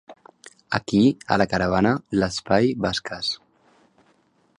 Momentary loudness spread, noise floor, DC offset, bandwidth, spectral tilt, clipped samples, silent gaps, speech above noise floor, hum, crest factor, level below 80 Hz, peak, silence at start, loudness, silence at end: 8 LU; -63 dBFS; under 0.1%; 11.5 kHz; -5.5 dB/octave; under 0.1%; none; 41 dB; none; 22 dB; -48 dBFS; -2 dBFS; 0.1 s; -22 LUFS; 1.25 s